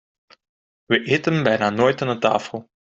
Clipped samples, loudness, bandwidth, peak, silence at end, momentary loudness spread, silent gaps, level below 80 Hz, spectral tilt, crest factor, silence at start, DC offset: under 0.1%; -20 LUFS; 7.8 kHz; -2 dBFS; 0.25 s; 4 LU; none; -60 dBFS; -6 dB/octave; 18 dB; 0.9 s; under 0.1%